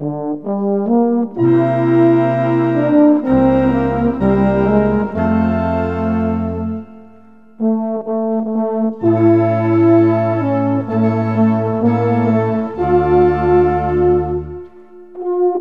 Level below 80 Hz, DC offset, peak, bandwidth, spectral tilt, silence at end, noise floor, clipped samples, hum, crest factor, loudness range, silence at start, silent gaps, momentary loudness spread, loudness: -36 dBFS; 0.6%; 0 dBFS; 4.7 kHz; -10.5 dB/octave; 0 s; -45 dBFS; under 0.1%; none; 14 dB; 5 LU; 0 s; none; 8 LU; -15 LUFS